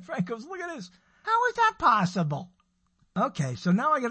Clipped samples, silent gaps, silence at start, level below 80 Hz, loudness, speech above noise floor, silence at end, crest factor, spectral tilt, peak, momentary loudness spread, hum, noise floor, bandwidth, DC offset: under 0.1%; none; 0 s; -62 dBFS; -26 LUFS; 43 dB; 0 s; 20 dB; -6 dB/octave; -8 dBFS; 15 LU; none; -69 dBFS; 8.6 kHz; under 0.1%